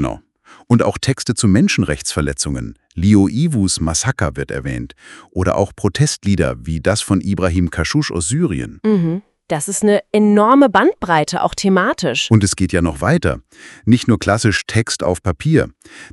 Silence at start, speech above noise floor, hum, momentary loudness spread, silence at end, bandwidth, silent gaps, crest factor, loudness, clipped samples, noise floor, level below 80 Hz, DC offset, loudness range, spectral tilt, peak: 0 s; 32 dB; none; 10 LU; 0.05 s; 12 kHz; none; 16 dB; -16 LUFS; under 0.1%; -47 dBFS; -38 dBFS; under 0.1%; 4 LU; -5 dB/octave; 0 dBFS